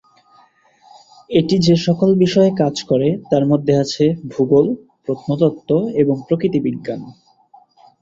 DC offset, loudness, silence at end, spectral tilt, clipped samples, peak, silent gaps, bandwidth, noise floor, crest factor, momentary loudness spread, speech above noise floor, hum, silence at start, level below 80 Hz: under 0.1%; -17 LUFS; 0.9 s; -7 dB/octave; under 0.1%; -2 dBFS; none; 7.8 kHz; -52 dBFS; 16 dB; 9 LU; 37 dB; none; 1.3 s; -52 dBFS